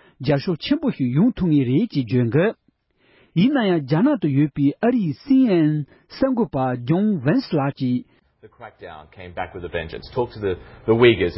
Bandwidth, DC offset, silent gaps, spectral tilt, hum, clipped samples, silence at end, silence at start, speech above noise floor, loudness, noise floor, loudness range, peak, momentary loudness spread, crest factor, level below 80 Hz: 5.8 kHz; under 0.1%; none; -12 dB/octave; none; under 0.1%; 0 s; 0.2 s; 42 dB; -20 LUFS; -62 dBFS; 7 LU; -2 dBFS; 12 LU; 18 dB; -48 dBFS